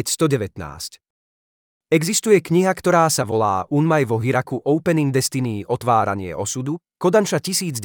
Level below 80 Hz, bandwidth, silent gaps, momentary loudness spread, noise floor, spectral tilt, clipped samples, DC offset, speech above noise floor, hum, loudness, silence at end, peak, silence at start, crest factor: -58 dBFS; 20 kHz; 1.10-1.81 s; 9 LU; under -90 dBFS; -5 dB/octave; under 0.1%; under 0.1%; over 71 dB; none; -19 LUFS; 0 s; -4 dBFS; 0 s; 16 dB